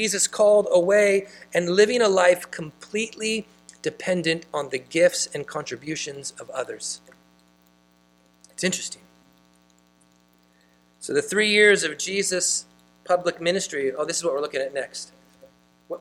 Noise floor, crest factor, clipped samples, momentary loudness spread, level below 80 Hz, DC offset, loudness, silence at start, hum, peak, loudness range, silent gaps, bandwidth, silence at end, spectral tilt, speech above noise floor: -60 dBFS; 20 dB; under 0.1%; 15 LU; -68 dBFS; under 0.1%; -23 LUFS; 0 s; 60 Hz at -55 dBFS; -4 dBFS; 13 LU; none; 15 kHz; 0.05 s; -2.5 dB/octave; 37 dB